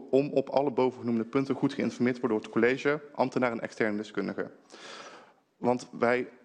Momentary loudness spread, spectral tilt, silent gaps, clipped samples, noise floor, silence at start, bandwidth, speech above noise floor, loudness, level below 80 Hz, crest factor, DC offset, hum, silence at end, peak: 15 LU; -6.5 dB/octave; none; under 0.1%; -55 dBFS; 0 s; 9.4 kHz; 26 dB; -29 LUFS; -72 dBFS; 20 dB; under 0.1%; none; 0.15 s; -10 dBFS